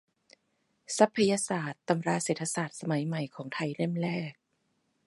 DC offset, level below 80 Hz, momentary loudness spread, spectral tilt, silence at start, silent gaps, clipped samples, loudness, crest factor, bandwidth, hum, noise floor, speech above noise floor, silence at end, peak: under 0.1%; -78 dBFS; 10 LU; -5 dB/octave; 0.9 s; none; under 0.1%; -30 LUFS; 24 dB; 11.5 kHz; none; -76 dBFS; 46 dB; 0.75 s; -8 dBFS